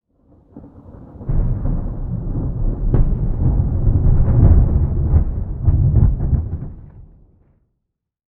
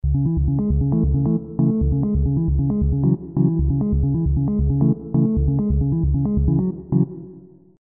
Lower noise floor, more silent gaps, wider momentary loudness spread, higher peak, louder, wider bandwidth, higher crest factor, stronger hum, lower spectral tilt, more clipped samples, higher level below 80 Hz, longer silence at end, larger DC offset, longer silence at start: first, -76 dBFS vs -44 dBFS; neither; first, 12 LU vs 3 LU; first, 0 dBFS vs -6 dBFS; about the same, -18 LUFS vs -20 LUFS; first, 2.1 kHz vs 1.4 kHz; about the same, 16 dB vs 14 dB; neither; second, -14.5 dB/octave vs -18.5 dB/octave; neither; first, -20 dBFS vs -26 dBFS; first, 1.35 s vs 0.4 s; second, under 0.1% vs 0.1%; first, 0.55 s vs 0.05 s